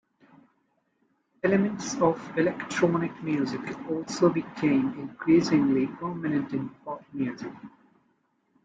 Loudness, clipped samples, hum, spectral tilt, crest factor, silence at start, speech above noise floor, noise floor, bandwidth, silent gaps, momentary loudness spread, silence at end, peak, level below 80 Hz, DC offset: -27 LUFS; under 0.1%; none; -6 dB/octave; 20 dB; 1.45 s; 46 dB; -72 dBFS; 9 kHz; none; 11 LU; 0.95 s; -8 dBFS; -66 dBFS; under 0.1%